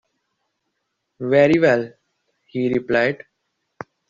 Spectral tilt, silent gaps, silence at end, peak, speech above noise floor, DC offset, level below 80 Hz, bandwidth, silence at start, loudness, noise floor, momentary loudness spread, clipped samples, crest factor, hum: -5 dB/octave; none; 0.95 s; -4 dBFS; 58 dB; under 0.1%; -60 dBFS; 7.4 kHz; 1.2 s; -18 LUFS; -75 dBFS; 20 LU; under 0.1%; 18 dB; none